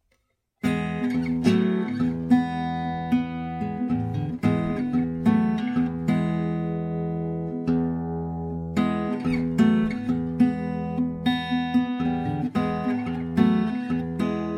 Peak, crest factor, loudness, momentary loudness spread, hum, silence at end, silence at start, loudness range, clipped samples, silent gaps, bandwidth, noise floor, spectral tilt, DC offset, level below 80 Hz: -6 dBFS; 18 dB; -25 LUFS; 7 LU; none; 0 s; 0.65 s; 2 LU; under 0.1%; none; 9.8 kHz; -71 dBFS; -8 dB/octave; under 0.1%; -48 dBFS